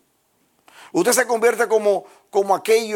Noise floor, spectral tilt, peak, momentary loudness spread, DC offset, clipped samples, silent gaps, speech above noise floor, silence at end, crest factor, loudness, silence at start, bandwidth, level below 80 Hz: -64 dBFS; -2.5 dB/octave; -2 dBFS; 7 LU; under 0.1%; under 0.1%; none; 46 dB; 0 s; 18 dB; -19 LUFS; 0.95 s; 17.5 kHz; -74 dBFS